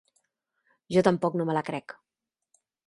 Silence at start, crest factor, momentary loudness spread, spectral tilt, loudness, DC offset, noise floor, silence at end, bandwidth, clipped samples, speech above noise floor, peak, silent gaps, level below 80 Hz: 0.9 s; 24 dB; 14 LU; -7 dB/octave; -27 LUFS; under 0.1%; -77 dBFS; 0.95 s; 11.5 kHz; under 0.1%; 51 dB; -6 dBFS; none; -66 dBFS